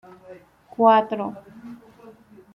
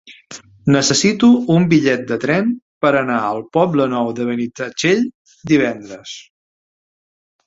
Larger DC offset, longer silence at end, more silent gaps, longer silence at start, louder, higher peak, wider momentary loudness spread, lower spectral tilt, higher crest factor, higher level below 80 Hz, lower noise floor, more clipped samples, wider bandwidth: neither; second, 0.8 s vs 1.25 s; second, none vs 2.62-2.81 s, 5.14-5.25 s; first, 0.3 s vs 0.05 s; second, -20 LUFS vs -16 LUFS; second, -4 dBFS vs 0 dBFS; first, 25 LU vs 19 LU; first, -7.5 dB/octave vs -5 dB/octave; about the same, 20 dB vs 16 dB; second, -70 dBFS vs -56 dBFS; first, -48 dBFS vs -39 dBFS; neither; second, 5.6 kHz vs 8 kHz